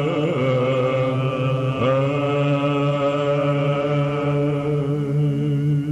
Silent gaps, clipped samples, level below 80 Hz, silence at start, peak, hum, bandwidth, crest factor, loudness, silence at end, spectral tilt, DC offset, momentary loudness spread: none; under 0.1%; -52 dBFS; 0 s; -10 dBFS; none; 8 kHz; 10 dB; -21 LUFS; 0 s; -8.5 dB/octave; under 0.1%; 2 LU